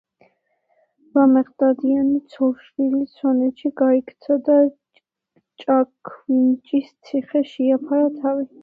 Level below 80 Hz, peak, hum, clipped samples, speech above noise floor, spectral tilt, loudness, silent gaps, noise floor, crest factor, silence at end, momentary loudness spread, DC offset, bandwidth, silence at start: -68 dBFS; -4 dBFS; none; under 0.1%; 48 dB; -8 dB/octave; -20 LUFS; none; -67 dBFS; 16 dB; 0.15 s; 8 LU; under 0.1%; 4.8 kHz; 1.15 s